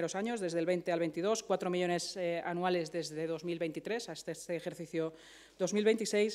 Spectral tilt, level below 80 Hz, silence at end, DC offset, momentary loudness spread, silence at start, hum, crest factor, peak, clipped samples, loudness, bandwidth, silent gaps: -4.5 dB/octave; -76 dBFS; 0 s; under 0.1%; 9 LU; 0 s; none; 18 dB; -18 dBFS; under 0.1%; -35 LUFS; 15 kHz; none